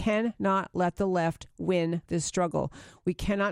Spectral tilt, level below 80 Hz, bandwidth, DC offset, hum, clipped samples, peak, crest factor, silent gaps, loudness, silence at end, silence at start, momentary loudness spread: -5.5 dB/octave; -50 dBFS; 14 kHz; under 0.1%; none; under 0.1%; -14 dBFS; 16 dB; none; -29 LUFS; 0 s; 0 s; 7 LU